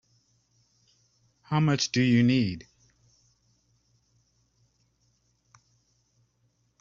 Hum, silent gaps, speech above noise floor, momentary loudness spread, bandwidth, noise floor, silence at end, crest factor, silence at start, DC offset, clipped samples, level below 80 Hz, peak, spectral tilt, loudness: none; none; 48 dB; 10 LU; 7.4 kHz; -71 dBFS; 4.2 s; 20 dB; 1.5 s; under 0.1%; under 0.1%; -66 dBFS; -12 dBFS; -5.5 dB/octave; -25 LUFS